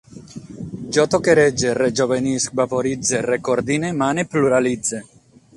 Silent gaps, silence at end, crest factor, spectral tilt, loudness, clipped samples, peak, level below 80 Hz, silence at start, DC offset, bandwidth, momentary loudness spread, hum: none; 0.55 s; 18 dB; -4.5 dB/octave; -19 LUFS; under 0.1%; 0 dBFS; -52 dBFS; 0.15 s; under 0.1%; 11.5 kHz; 17 LU; none